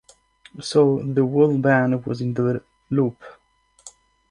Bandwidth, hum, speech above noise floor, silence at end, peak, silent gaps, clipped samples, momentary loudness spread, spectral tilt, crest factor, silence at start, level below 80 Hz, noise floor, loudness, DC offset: 11 kHz; none; 42 dB; 0.4 s; -4 dBFS; none; under 0.1%; 8 LU; -7 dB/octave; 18 dB; 0.55 s; -60 dBFS; -61 dBFS; -21 LUFS; under 0.1%